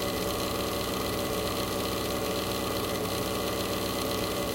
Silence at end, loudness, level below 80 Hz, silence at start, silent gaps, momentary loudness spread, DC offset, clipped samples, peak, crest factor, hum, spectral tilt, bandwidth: 0 s; -30 LUFS; -46 dBFS; 0 s; none; 0 LU; under 0.1%; under 0.1%; -16 dBFS; 14 dB; none; -4 dB/octave; 17 kHz